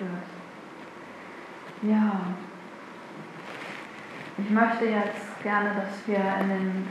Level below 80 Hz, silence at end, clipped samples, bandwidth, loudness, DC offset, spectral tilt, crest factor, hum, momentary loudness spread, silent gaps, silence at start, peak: -82 dBFS; 0 s; under 0.1%; 11 kHz; -28 LUFS; under 0.1%; -7 dB/octave; 22 dB; none; 19 LU; none; 0 s; -6 dBFS